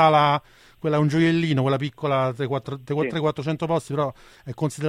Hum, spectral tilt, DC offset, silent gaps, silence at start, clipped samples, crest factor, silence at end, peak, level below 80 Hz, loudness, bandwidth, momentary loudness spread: none; -7 dB/octave; under 0.1%; none; 0 s; under 0.1%; 18 dB; 0 s; -6 dBFS; -58 dBFS; -23 LUFS; 11.5 kHz; 10 LU